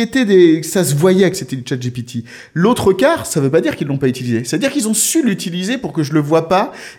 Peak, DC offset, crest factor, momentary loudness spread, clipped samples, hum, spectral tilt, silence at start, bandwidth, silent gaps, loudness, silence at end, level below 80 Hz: 0 dBFS; under 0.1%; 14 dB; 10 LU; under 0.1%; none; -5 dB/octave; 0 s; 17.5 kHz; none; -15 LUFS; 0.05 s; -50 dBFS